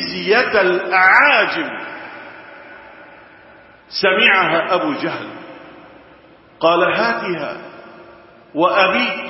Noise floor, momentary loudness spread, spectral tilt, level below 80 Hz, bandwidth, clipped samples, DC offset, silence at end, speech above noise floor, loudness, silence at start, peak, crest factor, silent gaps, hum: -46 dBFS; 23 LU; -6 dB/octave; -60 dBFS; 7.6 kHz; under 0.1%; under 0.1%; 0 s; 30 dB; -15 LUFS; 0 s; 0 dBFS; 18 dB; none; none